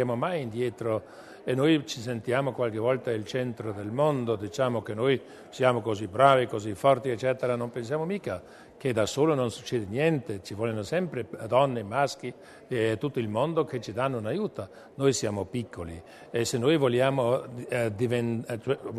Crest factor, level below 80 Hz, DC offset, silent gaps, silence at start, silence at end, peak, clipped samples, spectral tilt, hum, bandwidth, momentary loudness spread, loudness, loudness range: 22 dB; -64 dBFS; under 0.1%; none; 0 s; 0 s; -6 dBFS; under 0.1%; -6 dB/octave; none; 13.5 kHz; 10 LU; -28 LUFS; 4 LU